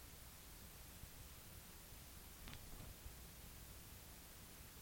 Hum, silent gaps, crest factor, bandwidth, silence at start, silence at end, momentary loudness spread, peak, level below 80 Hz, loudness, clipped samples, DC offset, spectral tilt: none; none; 24 dB; 17 kHz; 0 s; 0 s; 2 LU; -32 dBFS; -62 dBFS; -57 LUFS; under 0.1%; under 0.1%; -3 dB/octave